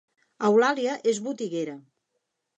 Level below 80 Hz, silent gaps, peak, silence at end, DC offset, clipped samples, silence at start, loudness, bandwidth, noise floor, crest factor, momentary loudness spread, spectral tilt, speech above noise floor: -82 dBFS; none; -10 dBFS; 0.75 s; under 0.1%; under 0.1%; 0.4 s; -25 LUFS; 8.8 kHz; -79 dBFS; 16 dB; 13 LU; -4.5 dB/octave; 55 dB